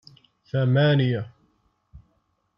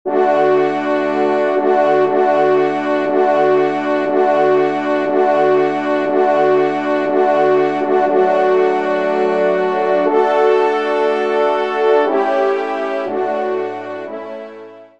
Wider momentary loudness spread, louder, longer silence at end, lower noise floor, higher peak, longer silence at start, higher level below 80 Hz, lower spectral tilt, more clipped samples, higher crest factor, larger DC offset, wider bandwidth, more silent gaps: first, 11 LU vs 6 LU; second, -22 LUFS vs -15 LUFS; first, 0.6 s vs 0.15 s; first, -70 dBFS vs -36 dBFS; second, -10 dBFS vs -2 dBFS; first, 0.55 s vs 0.05 s; first, -60 dBFS vs -70 dBFS; first, -9.5 dB/octave vs -6.5 dB/octave; neither; about the same, 16 dB vs 12 dB; second, under 0.1% vs 0.4%; second, 5.6 kHz vs 7.8 kHz; neither